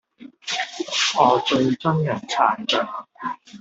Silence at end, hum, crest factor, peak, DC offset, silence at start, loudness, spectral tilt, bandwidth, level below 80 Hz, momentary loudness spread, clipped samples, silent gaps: 0.05 s; none; 20 dB; -2 dBFS; under 0.1%; 0.2 s; -21 LUFS; -4 dB/octave; 8.2 kHz; -64 dBFS; 14 LU; under 0.1%; none